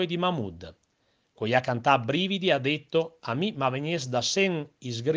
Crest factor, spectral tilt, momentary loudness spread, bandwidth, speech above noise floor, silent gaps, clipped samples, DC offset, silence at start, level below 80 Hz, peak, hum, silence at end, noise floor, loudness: 20 dB; -4.5 dB/octave; 11 LU; 10 kHz; 44 dB; none; under 0.1%; under 0.1%; 0 s; -66 dBFS; -6 dBFS; none; 0 s; -71 dBFS; -27 LUFS